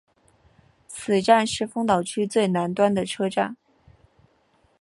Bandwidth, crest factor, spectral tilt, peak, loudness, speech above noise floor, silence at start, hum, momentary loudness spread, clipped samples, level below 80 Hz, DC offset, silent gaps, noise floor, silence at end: 11.5 kHz; 22 dB; -5 dB/octave; -4 dBFS; -23 LUFS; 41 dB; 0.9 s; none; 9 LU; under 0.1%; -62 dBFS; under 0.1%; none; -63 dBFS; 1.25 s